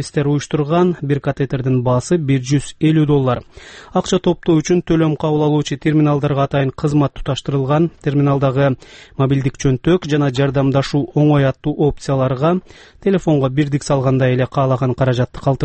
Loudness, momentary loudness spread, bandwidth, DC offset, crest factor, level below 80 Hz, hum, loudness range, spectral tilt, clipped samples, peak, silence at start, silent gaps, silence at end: -16 LUFS; 5 LU; 8.8 kHz; under 0.1%; 12 dB; -40 dBFS; none; 1 LU; -7 dB/octave; under 0.1%; -4 dBFS; 0 s; none; 0 s